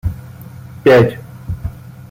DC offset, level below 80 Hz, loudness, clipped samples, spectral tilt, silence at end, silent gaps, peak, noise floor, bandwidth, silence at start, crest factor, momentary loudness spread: under 0.1%; -34 dBFS; -14 LUFS; under 0.1%; -7.5 dB/octave; 0.4 s; none; -2 dBFS; -33 dBFS; 16.5 kHz; 0.05 s; 16 dB; 24 LU